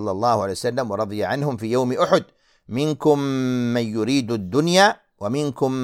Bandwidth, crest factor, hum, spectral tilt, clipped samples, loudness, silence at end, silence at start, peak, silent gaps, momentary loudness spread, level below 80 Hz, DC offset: 16 kHz; 20 dB; none; -5.5 dB/octave; under 0.1%; -21 LUFS; 0 s; 0 s; -2 dBFS; none; 7 LU; -60 dBFS; under 0.1%